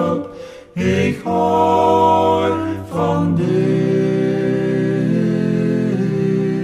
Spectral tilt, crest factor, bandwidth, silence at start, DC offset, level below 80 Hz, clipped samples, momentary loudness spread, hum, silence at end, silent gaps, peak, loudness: -8 dB/octave; 14 dB; 13 kHz; 0 s; under 0.1%; -52 dBFS; under 0.1%; 8 LU; none; 0 s; none; -2 dBFS; -17 LUFS